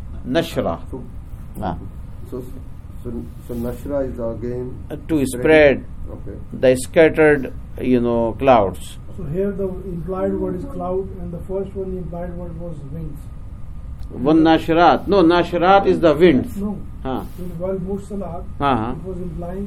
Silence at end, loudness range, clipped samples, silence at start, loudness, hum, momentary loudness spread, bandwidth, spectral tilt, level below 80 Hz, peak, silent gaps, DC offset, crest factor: 0 s; 13 LU; under 0.1%; 0 s; -19 LUFS; none; 20 LU; 15.5 kHz; -6.5 dB/octave; -34 dBFS; 0 dBFS; none; under 0.1%; 20 dB